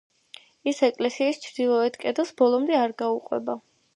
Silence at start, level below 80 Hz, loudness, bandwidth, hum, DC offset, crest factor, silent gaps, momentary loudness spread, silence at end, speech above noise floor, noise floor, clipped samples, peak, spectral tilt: 0.65 s; -78 dBFS; -25 LUFS; 11 kHz; none; under 0.1%; 18 dB; none; 8 LU; 0.35 s; 27 dB; -51 dBFS; under 0.1%; -8 dBFS; -4 dB/octave